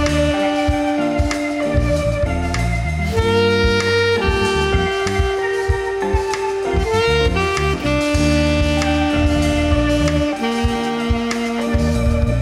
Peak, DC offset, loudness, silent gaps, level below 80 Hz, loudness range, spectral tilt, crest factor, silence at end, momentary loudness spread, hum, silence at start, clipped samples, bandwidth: -4 dBFS; under 0.1%; -18 LUFS; none; -24 dBFS; 1 LU; -5.5 dB/octave; 14 dB; 0 s; 4 LU; none; 0 s; under 0.1%; 14 kHz